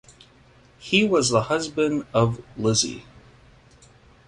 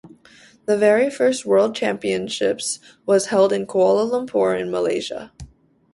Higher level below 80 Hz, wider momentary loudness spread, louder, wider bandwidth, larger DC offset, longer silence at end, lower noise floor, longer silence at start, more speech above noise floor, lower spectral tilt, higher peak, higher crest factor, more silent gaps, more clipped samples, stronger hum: about the same, -54 dBFS vs -56 dBFS; about the same, 8 LU vs 10 LU; about the same, -22 LUFS vs -20 LUFS; about the same, 11.5 kHz vs 11.5 kHz; neither; first, 1.25 s vs 0.45 s; first, -54 dBFS vs -50 dBFS; first, 0.8 s vs 0.05 s; about the same, 32 dB vs 31 dB; about the same, -4 dB/octave vs -4 dB/octave; about the same, -4 dBFS vs -4 dBFS; about the same, 20 dB vs 16 dB; neither; neither; neither